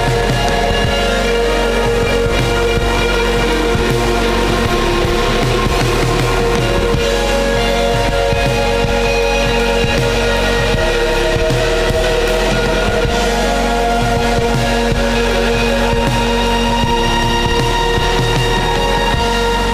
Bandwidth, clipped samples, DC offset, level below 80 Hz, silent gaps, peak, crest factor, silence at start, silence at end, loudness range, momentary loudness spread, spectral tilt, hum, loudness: 16 kHz; under 0.1%; under 0.1%; -20 dBFS; none; -2 dBFS; 12 dB; 0 s; 0 s; 0 LU; 1 LU; -4.5 dB/octave; none; -14 LUFS